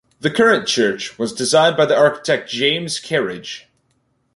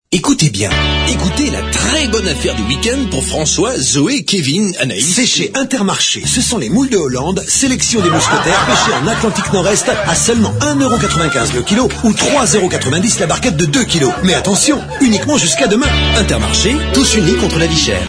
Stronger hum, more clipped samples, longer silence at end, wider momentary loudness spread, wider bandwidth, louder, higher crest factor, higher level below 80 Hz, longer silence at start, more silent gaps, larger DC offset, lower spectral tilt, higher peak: neither; neither; first, 0.75 s vs 0 s; first, 11 LU vs 4 LU; about the same, 11.5 kHz vs 11 kHz; second, -17 LUFS vs -12 LUFS; about the same, 16 dB vs 12 dB; second, -60 dBFS vs -26 dBFS; first, 0.25 s vs 0.1 s; neither; neither; about the same, -3.5 dB/octave vs -3.5 dB/octave; about the same, -2 dBFS vs 0 dBFS